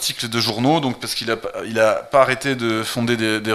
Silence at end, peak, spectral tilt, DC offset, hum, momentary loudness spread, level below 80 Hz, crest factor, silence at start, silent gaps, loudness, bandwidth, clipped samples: 0 s; 0 dBFS; -4 dB/octave; under 0.1%; none; 7 LU; -54 dBFS; 20 dB; 0 s; none; -19 LUFS; 15 kHz; under 0.1%